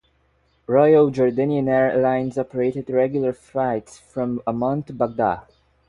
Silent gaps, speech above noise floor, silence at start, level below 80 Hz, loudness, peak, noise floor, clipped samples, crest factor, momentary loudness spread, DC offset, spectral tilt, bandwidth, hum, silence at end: none; 43 dB; 0.7 s; -56 dBFS; -21 LUFS; -4 dBFS; -63 dBFS; under 0.1%; 18 dB; 11 LU; under 0.1%; -8.5 dB/octave; 11 kHz; none; 0.5 s